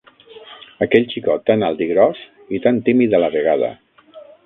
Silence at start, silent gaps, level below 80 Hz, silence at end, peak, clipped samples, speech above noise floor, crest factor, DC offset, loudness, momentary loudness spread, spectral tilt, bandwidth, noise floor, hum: 0.35 s; none; -56 dBFS; 0.2 s; 0 dBFS; under 0.1%; 27 dB; 18 dB; under 0.1%; -17 LUFS; 9 LU; -9.5 dB/octave; 4.1 kHz; -43 dBFS; none